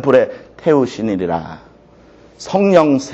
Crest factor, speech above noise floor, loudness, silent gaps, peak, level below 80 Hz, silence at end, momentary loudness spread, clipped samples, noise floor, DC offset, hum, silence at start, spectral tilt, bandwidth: 16 dB; 30 dB; -15 LUFS; none; 0 dBFS; -50 dBFS; 0 s; 12 LU; under 0.1%; -45 dBFS; under 0.1%; none; 0 s; -6.5 dB/octave; 8.2 kHz